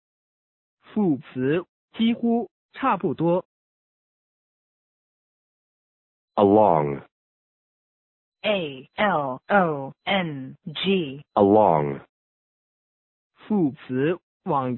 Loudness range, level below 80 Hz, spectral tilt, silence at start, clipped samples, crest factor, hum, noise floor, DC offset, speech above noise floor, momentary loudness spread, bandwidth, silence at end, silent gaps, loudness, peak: 6 LU; -60 dBFS; -11 dB/octave; 0.9 s; under 0.1%; 20 dB; none; under -90 dBFS; under 0.1%; over 68 dB; 14 LU; 4.2 kHz; 0 s; 1.69-1.88 s, 2.51-2.69 s, 3.45-6.28 s, 7.12-8.32 s, 12.09-13.30 s, 14.23-14.40 s; -23 LUFS; -4 dBFS